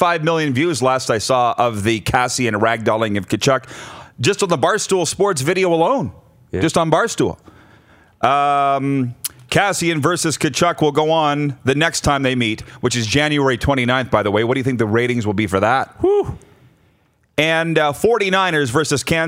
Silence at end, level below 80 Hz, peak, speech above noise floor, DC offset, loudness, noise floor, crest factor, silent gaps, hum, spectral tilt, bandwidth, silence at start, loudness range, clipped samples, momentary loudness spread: 0 s; -44 dBFS; 0 dBFS; 42 dB; under 0.1%; -17 LUFS; -58 dBFS; 18 dB; none; none; -4.5 dB/octave; 16 kHz; 0 s; 2 LU; under 0.1%; 5 LU